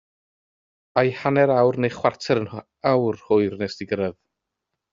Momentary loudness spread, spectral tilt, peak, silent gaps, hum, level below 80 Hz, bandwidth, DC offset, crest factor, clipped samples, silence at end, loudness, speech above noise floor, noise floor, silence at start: 9 LU; -5.5 dB/octave; -4 dBFS; none; none; -62 dBFS; 7.6 kHz; under 0.1%; 20 dB; under 0.1%; 0.8 s; -22 LUFS; 61 dB; -82 dBFS; 0.95 s